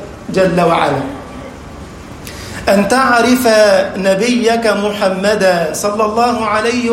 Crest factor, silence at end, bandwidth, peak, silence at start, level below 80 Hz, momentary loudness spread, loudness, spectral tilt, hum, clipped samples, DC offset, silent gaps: 12 dB; 0 s; 16.5 kHz; 0 dBFS; 0 s; -40 dBFS; 20 LU; -12 LUFS; -4.5 dB/octave; none; under 0.1%; under 0.1%; none